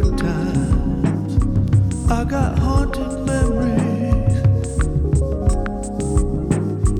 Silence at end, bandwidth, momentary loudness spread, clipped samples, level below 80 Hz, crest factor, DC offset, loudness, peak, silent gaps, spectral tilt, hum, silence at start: 0 s; 11 kHz; 4 LU; under 0.1%; -22 dBFS; 14 dB; under 0.1%; -19 LUFS; -4 dBFS; none; -7.5 dB/octave; none; 0 s